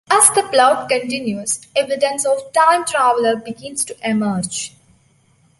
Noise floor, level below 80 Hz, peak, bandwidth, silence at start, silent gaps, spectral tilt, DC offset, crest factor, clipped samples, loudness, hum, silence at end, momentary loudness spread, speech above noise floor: -56 dBFS; -62 dBFS; 0 dBFS; 16 kHz; 0.1 s; none; -2.5 dB/octave; under 0.1%; 18 dB; under 0.1%; -17 LUFS; none; 0.9 s; 11 LU; 39 dB